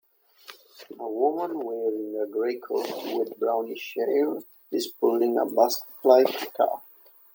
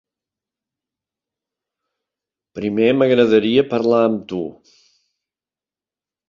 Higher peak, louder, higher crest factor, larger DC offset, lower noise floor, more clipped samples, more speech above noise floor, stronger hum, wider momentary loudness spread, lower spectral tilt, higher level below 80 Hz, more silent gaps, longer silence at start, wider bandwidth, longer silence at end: about the same, -4 dBFS vs -2 dBFS; second, -26 LUFS vs -17 LUFS; about the same, 22 dB vs 18 dB; neither; second, -51 dBFS vs under -90 dBFS; neither; second, 26 dB vs over 74 dB; neither; about the same, 13 LU vs 13 LU; second, -3.5 dB/octave vs -7.5 dB/octave; second, -84 dBFS vs -60 dBFS; neither; second, 0.5 s vs 2.55 s; first, 17 kHz vs 7.2 kHz; second, 0.5 s vs 1.75 s